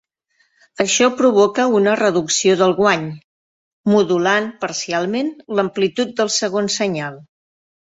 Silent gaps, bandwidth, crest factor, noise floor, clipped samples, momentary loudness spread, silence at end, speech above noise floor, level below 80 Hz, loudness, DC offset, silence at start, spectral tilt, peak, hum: 3.24-3.84 s; 8 kHz; 18 dB; -64 dBFS; under 0.1%; 9 LU; 0.6 s; 47 dB; -62 dBFS; -17 LUFS; under 0.1%; 0.8 s; -3.5 dB/octave; 0 dBFS; none